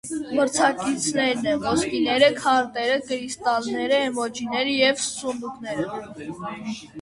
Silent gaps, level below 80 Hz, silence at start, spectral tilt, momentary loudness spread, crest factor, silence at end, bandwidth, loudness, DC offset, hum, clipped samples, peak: none; -58 dBFS; 0.05 s; -3 dB/octave; 14 LU; 20 dB; 0 s; 11.5 kHz; -23 LUFS; under 0.1%; none; under 0.1%; -4 dBFS